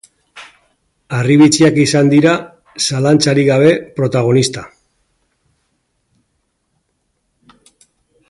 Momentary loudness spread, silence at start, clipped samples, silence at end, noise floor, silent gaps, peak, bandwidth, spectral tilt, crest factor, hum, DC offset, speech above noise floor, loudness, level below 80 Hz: 10 LU; 0.35 s; under 0.1%; 3.6 s; -67 dBFS; none; 0 dBFS; 11.5 kHz; -5.5 dB/octave; 16 dB; none; under 0.1%; 55 dB; -12 LUFS; -54 dBFS